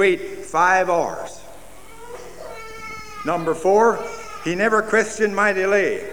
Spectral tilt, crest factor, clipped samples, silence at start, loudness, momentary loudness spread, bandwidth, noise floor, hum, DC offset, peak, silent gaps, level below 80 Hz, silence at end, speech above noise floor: -4.5 dB/octave; 16 dB; under 0.1%; 0 s; -19 LUFS; 20 LU; over 20 kHz; -43 dBFS; none; 1%; -4 dBFS; none; -52 dBFS; 0 s; 24 dB